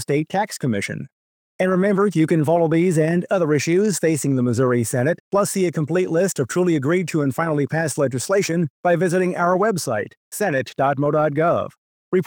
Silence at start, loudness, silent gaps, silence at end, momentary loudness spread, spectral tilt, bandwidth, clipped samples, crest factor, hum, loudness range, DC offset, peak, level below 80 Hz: 0 s; -20 LUFS; 1.12-1.59 s, 5.20-5.31 s, 8.70-8.83 s, 10.17-10.31 s, 11.78-12.12 s; 0 s; 6 LU; -6 dB/octave; 20 kHz; under 0.1%; 14 dB; none; 2 LU; under 0.1%; -6 dBFS; -66 dBFS